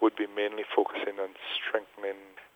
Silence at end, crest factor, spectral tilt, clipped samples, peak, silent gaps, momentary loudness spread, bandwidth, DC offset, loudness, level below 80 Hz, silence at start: 0.1 s; 22 dB; -4 dB/octave; under 0.1%; -10 dBFS; none; 9 LU; 15.5 kHz; under 0.1%; -32 LUFS; -82 dBFS; 0 s